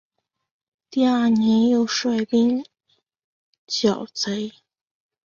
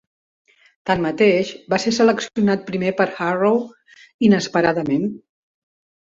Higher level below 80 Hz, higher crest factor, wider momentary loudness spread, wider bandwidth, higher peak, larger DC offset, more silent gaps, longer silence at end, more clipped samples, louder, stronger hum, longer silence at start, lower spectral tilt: second, -64 dBFS vs -56 dBFS; about the same, 16 dB vs 16 dB; first, 10 LU vs 6 LU; about the same, 7.4 kHz vs 7.8 kHz; about the same, -6 dBFS vs -4 dBFS; neither; first, 3.24-3.67 s vs 4.14-4.19 s; about the same, 0.75 s vs 0.85 s; neither; about the same, -21 LUFS vs -19 LUFS; neither; about the same, 0.9 s vs 0.85 s; about the same, -4.5 dB/octave vs -5.5 dB/octave